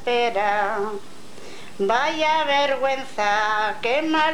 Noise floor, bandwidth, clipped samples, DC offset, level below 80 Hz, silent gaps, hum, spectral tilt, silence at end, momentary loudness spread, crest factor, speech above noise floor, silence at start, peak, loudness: -42 dBFS; 17 kHz; under 0.1%; 2%; -70 dBFS; none; none; -3 dB/octave; 0 s; 17 LU; 16 dB; 20 dB; 0 s; -6 dBFS; -21 LUFS